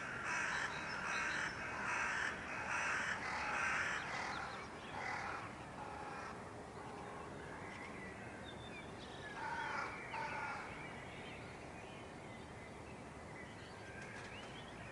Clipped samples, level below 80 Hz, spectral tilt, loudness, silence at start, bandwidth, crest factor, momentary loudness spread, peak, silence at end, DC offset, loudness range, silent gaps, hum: under 0.1%; -66 dBFS; -3.5 dB/octave; -44 LUFS; 0 s; 11.5 kHz; 18 dB; 13 LU; -26 dBFS; 0 s; under 0.1%; 11 LU; none; none